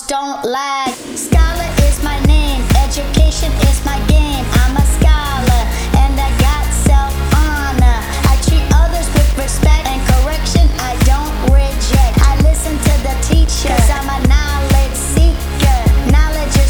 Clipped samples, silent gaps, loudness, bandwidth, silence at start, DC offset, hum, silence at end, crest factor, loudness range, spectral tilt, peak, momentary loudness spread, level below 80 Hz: under 0.1%; none; -14 LUFS; over 20 kHz; 0 s; under 0.1%; none; 0 s; 12 dB; 1 LU; -5 dB/octave; 0 dBFS; 3 LU; -12 dBFS